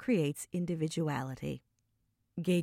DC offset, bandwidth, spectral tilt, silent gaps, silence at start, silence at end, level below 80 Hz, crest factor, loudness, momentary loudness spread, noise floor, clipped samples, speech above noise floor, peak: under 0.1%; 16 kHz; -6.5 dB/octave; none; 0 s; 0 s; -66 dBFS; 14 dB; -35 LUFS; 11 LU; -78 dBFS; under 0.1%; 45 dB; -20 dBFS